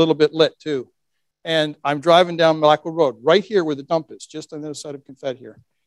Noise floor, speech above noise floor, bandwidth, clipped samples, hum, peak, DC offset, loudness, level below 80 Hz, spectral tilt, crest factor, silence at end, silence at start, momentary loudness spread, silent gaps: -77 dBFS; 58 dB; 12 kHz; under 0.1%; none; 0 dBFS; under 0.1%; -18 LUFS; -70 dBFS; -5 dB/octave; 20 dB; 0.35 s; 0 s; 18 LU; none